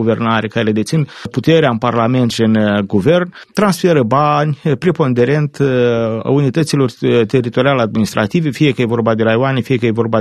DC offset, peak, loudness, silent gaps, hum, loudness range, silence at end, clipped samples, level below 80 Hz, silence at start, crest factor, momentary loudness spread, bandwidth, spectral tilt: under 0.1%; 0 dBFS; -14 LUFS; none; none; 1 LU; 0 s; under 0.1%; -50 dBFS; 0 s; 14 dB; 4 LU; 13 kHz; -6.5 dB/octave